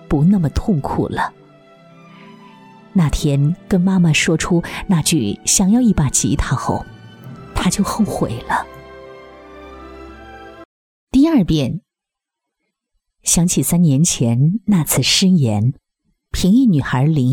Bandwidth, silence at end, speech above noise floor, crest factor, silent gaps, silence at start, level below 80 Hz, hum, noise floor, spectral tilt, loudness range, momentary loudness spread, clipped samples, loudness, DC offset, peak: 17.5 kHz; 0 s; 68 dB; 16 dB; 10.65-11.07 s; 0.1 s; -34 dBFS; none; -83 dBFS; -5 dB/octave; 8 LU; 22 LU; under 0.1%; -16 LUFS; under 0.1%; 0 dBFS